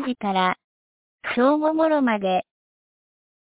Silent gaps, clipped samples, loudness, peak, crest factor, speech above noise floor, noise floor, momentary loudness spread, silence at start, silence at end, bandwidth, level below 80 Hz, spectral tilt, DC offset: 0.64-1.19 s; under 0.1%; -22 LUFS; -8 dBFS; 16 dB; over 69 dB; under -90 dBFS; 9 LU; 0 s; 1.15 s; 4 kHz; -66 dBFS; -9.5 dB/octave; under 0.1%